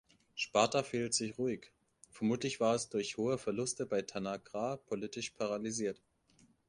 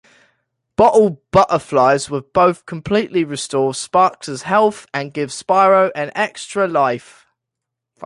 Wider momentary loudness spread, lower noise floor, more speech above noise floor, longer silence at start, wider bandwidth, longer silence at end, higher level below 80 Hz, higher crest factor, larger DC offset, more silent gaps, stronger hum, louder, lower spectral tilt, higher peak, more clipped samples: second, 9 LU vs 12 LU; second, -69 dBFS vs -81 dBFS; second, 33 dB vs 65 dB; second, 0.35 s vs 0.8 s; about the same, 11.5 kHz vs 11.5 kHz; first, 0.75 s vs 0 s; second, -72 dBFS vs -50 dBFS; first, 24 dB vs 16 dB; neither; neither; neither; second, -36 LUFS vs -16 LUFS; about the same, -4 dB/octave vs -5 dB/octave; second, -14 dBFS vs -2 dBFS; neither